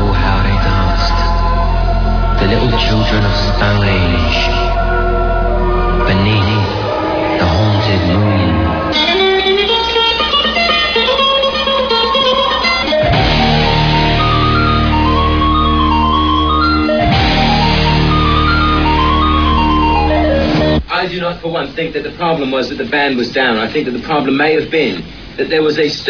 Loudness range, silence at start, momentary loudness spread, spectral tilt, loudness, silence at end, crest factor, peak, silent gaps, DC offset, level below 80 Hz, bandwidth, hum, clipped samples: 4 LU; 0 s; 5 LU; -6.5 dB/octave; -12 LUFS; 0 s; 12 dB; 0 dBFS; none; under 0.1%; -20 dBFS; 5.4 kHz; none; under 0.1%